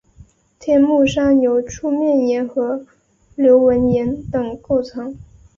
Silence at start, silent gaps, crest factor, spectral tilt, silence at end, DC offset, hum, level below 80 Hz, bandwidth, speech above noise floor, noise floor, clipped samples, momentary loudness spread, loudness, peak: 0.6 s; none; 14 dB; -6.5 dB/octave; 0.35 s; under 0.1%; none; -44 dBFS; 7.4 kHz; 32 dB; -47 dBFS; under 0.1%; 15 LU; -16 LUFS; -2 dBFS